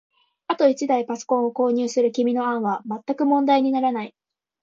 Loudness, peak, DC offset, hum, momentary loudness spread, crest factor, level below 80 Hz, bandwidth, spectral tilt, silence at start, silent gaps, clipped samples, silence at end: -22 LUFS; -6 dBFS; under 0.1%; none; 9 LU; 16 dB; -74 dBFS; 7.6 kHz; -5 dB/octave; 0.5 s; none; under 0.1%; 0.55 s